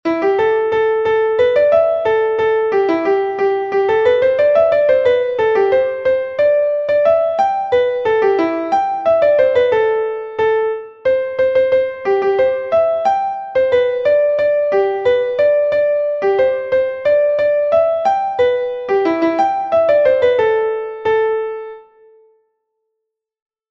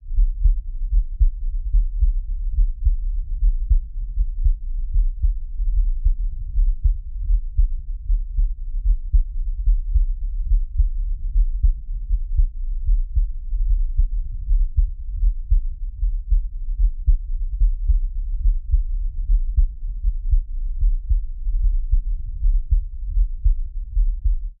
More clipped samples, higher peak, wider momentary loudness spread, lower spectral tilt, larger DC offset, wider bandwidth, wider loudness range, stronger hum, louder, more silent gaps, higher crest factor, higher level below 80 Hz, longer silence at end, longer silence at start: neither; first, -2 dBFS vs -6 dBFS; about the same, 5 LU vs 6 LU; second, -6 dB/octave vs -16.5 dB/octave; neither; first, 6.6 kHz vs 0.3 kHz; about the same, 2 LU vs 1 LU; neither; first, -15 LUFS vs -26 LUFS; neither; about the same, 12 dB vs 12 dB; second, -54 dBFS vs -20 dBFS; first, 1.9 s vs 0.1 s; about the same, 0.05 s vs 0 s